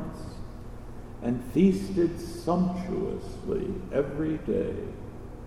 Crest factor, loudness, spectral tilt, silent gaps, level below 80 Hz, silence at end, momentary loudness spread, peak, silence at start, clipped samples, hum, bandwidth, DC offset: 18 dB; -29 LUFS; -8 dB/octave; none; -44 dBFS; 0 s; 19 LU; -10 dBFS; 0 s; under 0.1%; 60 Hz at -50 dBFS; 13.5 kHz; under 0.1%